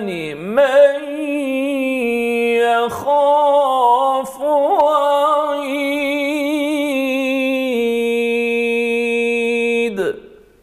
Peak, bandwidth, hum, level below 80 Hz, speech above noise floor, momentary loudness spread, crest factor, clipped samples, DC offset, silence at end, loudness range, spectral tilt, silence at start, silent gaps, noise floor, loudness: -2 dBFS; 15 kHz; none; -58 dBFS; 24 dB; 7 LU; 14 dB; under 0.1%; under 0.1%; 0.35 s; 3 LU; -4 dB/octave; 0 s; none; -39 dBFS; -16 LUFS